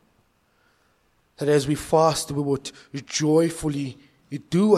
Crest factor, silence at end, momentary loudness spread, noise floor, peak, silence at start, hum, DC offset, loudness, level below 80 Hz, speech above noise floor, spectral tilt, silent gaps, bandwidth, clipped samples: 20 dB; 0 s; 15 LU; -65 dBFS; -4 dBFS; 1.4 s; none; under 0.1%; -23 LUFS; -52 dBFS; 43 dB; -5.5 dB/octave; none; 15 kHz; under 0.1%